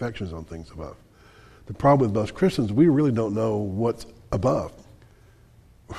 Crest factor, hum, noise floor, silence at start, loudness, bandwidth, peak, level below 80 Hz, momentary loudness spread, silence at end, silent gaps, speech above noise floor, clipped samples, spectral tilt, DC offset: 18 dB; none; -53 dBFS; 0 s; -23 LUFS; 13 kHz; -6 dBFS; -48 dBFS; 20 LU; 0 s; none; 30 dB; under 0.1%; -8 dB/octave; under 0.1%